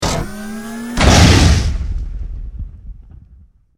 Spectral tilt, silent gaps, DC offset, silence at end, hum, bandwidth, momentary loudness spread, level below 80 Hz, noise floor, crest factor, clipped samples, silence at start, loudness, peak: -4.5 dB/octave; none; under 0.1%; 0.8 s; none; 16 kHz; 22 LU; -20 dBFS; -46 dBFS; 16 dB; under 0.1%; 0 s; -13 LUFS; 0 dBFS